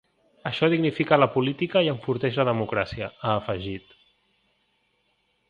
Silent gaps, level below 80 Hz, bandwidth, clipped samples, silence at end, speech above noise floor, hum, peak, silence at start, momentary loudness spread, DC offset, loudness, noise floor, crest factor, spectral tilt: none; -56 dBFS; 7.2 kHz; under 0.1%; 1.7 s; 46 dB; none; -4 dBFS; 0.45 s; 11 LU; under 0.1%; -24 LUFS; -70 dBFS; 22 dB; -8 dB/octave